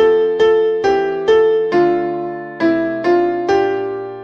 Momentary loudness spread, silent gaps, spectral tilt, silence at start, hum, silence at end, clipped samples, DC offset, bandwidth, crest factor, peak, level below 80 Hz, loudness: 8 LU; none; -6 dB/octave; 0 s; none; 0 s; under 0.1%; under 0.1%; 7 kHz; 12 dB; -2 dBFS; -50 dBFS; -15 LUFS